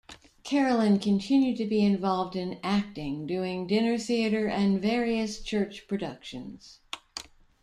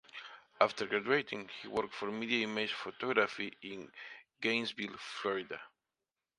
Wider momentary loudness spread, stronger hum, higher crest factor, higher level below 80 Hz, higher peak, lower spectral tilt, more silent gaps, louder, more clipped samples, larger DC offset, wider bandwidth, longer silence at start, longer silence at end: about the same, 16 LU vs 16 LU; neither; second, 14 dB vs 28 dB; first, -56 dBFS vs -78 dBFS; second, -14 dBFS vs -10 dBFS; first, -6 dB/octave vs -4 dB/octave; neither; first, -27 LUFS vs -35 LUFS; neither; neither; about the same, 11 kHz vs 11 kHz; about the same, 0.1 s vs 0.15 s; second, 0.4 s vs 0.7 s